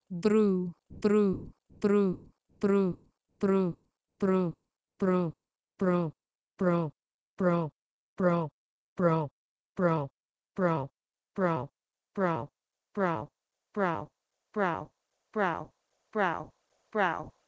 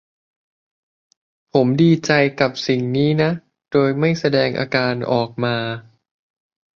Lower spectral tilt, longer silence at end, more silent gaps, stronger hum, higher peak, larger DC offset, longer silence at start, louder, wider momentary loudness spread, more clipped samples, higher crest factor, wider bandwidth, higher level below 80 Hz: first, -8.5 dB/octave vs -6.5 dB/octave; second, 0.2 s vs 0.95 s; first, 6.35-6.55 s, 7.14-7.37 s, 7.72-8.16 s, 8.51-8.96 s, 9.31-9.75 s, 10.11-10.34 s vs none; neither; second, -12 dBFS vs -2 dBFS; neither; second, 0.1 s vs 1.55 s; second, -31 LUFS vs -18 LUFS; first, 16 LU vs 7 LU; neither; about the same, 18 dB vs 18 dB; first, 8 kHz vs 7.2 kHz; second, -64 dBFS vs -58 dBFS